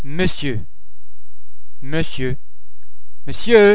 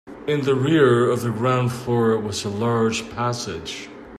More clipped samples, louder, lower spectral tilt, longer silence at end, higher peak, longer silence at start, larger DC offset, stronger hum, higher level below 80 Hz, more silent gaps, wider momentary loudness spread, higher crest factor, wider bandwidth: neither; about the same, -20 LUFS vs -21 LUFS; first, -9.5 dB/octave vs -6 dB/octave; about the same, 0 s vs 0 s; first, 0 dBFS vs -4 dBFS; about the same, 0 s vs 0.05 s; first, 20% vs under 0.1%; neither; first, -40 dBFS vs -54 dBFS; neither; first, 21 LU vs 12 LU; about the same, 20 dB vs 16 dB; second, 4 kHz vs 14.5 kHz